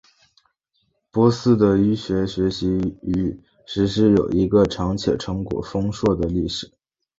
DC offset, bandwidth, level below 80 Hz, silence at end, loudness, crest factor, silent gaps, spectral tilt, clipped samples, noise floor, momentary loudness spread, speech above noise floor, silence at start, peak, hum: under 0.1%; 7.8 kHz; -40 dBFS; 0.55 s; -21 LUFS; 18 dB; none; -7 dB/octave; under 0.1%; -70 dBFS; 10 LU; 50 dB; 1.15 s; -4 dBFS; none